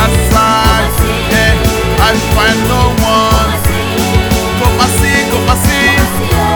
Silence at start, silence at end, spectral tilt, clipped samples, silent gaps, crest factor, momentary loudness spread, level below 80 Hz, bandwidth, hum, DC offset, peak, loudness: 0 s; 0 s; -4.5 dB/octave; 0.2%; none; 10 dB; 4 LU; -16 dBFS; over 20 kHz; none; under 0.1%; 0 dBFS; -10 LUFS